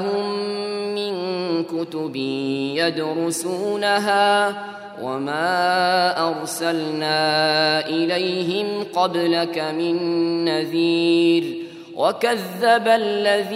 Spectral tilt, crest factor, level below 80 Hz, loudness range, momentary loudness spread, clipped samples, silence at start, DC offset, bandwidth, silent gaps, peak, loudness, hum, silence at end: -4 dB/octave; 16 dB; -74 dBFS; 3 LU; 8 LU; under 0.1%; 0 s; under 0.1%; 15.5 kHz; none; -4 dBFS; -20 LUFS; none; 0 s